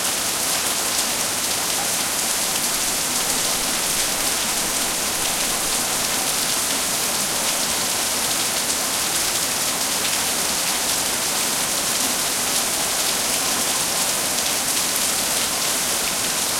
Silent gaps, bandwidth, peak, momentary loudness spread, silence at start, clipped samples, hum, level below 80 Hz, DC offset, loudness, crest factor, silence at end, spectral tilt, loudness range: none; 16.5 kHz; -2 dBFS; 1 LU; 0 s; under 0.1%; none; -50 dBFS; under 0.1%; -19 LUFS; 20 dB; 0 s; 0 dB/octave; 1 LU